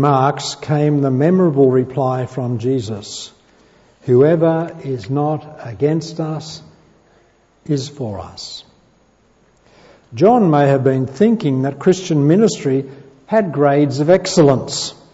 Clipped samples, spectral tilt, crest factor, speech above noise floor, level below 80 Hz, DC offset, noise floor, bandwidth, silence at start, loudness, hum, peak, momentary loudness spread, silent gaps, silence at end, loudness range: under 0.1%; -6.5 dB/octave; 16 dB; 39 dB; -56 dBFS; under 0.1%; -55 dBFS; 8 kHz; 0 s; -16 LUFS; none; -2 dBFS; 16 LU; none; 0.2 s; 12 LU